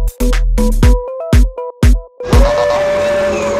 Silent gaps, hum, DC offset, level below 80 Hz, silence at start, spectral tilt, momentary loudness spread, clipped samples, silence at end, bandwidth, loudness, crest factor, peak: none; none; under 0.1%; -14 dBFS; 0 s; -6 dB/octave; 5 LU; under 0.1%; 0 s; 14.5 kHz; -14 LUFS; 12 dB; 0 dBFS